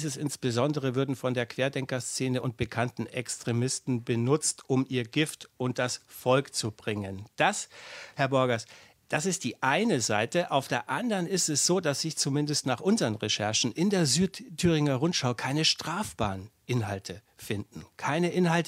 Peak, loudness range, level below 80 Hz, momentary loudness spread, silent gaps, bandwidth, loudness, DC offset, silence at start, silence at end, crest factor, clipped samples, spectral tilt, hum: -8 dBFS; 4 LU; -60 dBFS; 10 LU; none; 16 kHz; -28 LUFS; under 0.1%; 0 s; 0 s; 20 dB; under 0.1%; -4 dB/octave; none